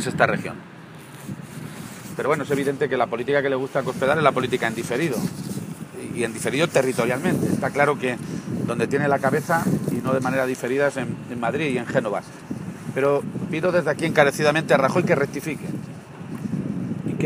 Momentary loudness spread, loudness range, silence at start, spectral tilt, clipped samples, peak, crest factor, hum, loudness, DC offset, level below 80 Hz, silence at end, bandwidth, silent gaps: 16 LU; 4 LU; 0 s; -5.5 dB/octave; under 0.1%; 0 dBFS; 22 dB; none; -23 LUFS; under 0.1%; -58 dBFS; 0 s; 15.5 kHz; none